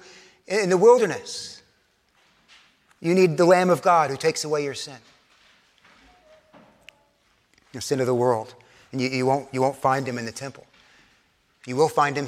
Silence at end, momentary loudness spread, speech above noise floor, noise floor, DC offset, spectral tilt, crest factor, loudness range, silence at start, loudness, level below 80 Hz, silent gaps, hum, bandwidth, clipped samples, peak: 0 s; 18 LU; 43 dB; -65 dBFS; under 0.1%; -5 dB/octave; 20 dB; 10 LU; 0.5 s; -22 LUFS; -68 dBFS; none; none; 15 kHz; under 0.1%; -4 dBFS